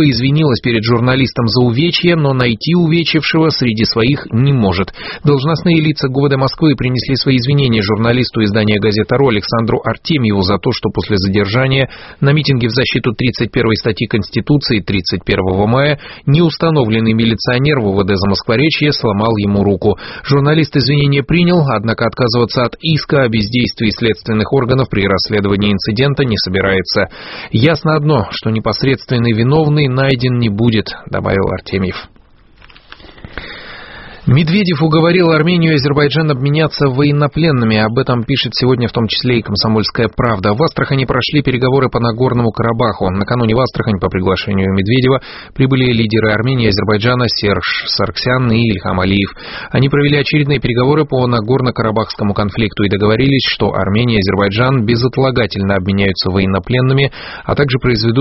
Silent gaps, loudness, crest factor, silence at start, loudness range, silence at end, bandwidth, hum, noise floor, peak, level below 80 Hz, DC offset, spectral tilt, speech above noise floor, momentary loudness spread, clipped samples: none; -13 LUFS; 12 dB; 0 s; 2 LU; 0 s; 6 kHz; none; -43 dBFS; 0 dBFS; -36 dBFS; under 0.1%; -5 dB/octave; 30 dB; 4 LU; under 0.1%